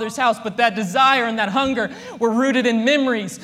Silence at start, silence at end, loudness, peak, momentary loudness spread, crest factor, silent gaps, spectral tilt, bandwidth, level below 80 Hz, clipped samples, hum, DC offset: 0 s; 0 s; -18 LUFS; -2 dBFS; 6 LU; 16 dB; none; -4 dB/octave; 15 kHz; -58 dBFS; under 0.1%; none; under 0.1%